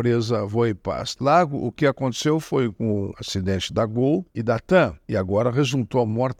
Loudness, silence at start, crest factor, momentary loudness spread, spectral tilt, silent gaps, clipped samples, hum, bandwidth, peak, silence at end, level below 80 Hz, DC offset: -22 LUFS; 0 s; 18 dB; 6 LU; -6 dB/octave; none; under 0.1%; none; 14.5 kHz; -4 dBFS; 0.05 s; -52 dBFS; under 0.1%